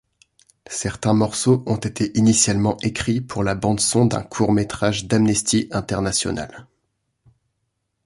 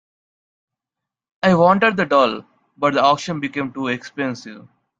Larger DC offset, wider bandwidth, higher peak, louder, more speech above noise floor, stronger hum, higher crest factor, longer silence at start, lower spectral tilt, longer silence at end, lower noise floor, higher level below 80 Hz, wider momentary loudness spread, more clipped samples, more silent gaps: neither; first, 11.5 kHz vs 7.8 kHz; about the same, -2 dBFS vs 0 dBFS; about the same, -20 LUFS vs -18 LUFS; second, 55 dB vs 67 dB; neither; about the same, 18 dB vs 20 dB; second, 0.7 s vs 1.45 s; second, -4.5 dB/octave vs -6 dB/octave; first, 1.45 s vs 0.4 s; second, -74 dBFS vs -85 dBFS; first, -44 dBFS vs -60 dBFS; second, 8 LU vs 12 LU; neither; neither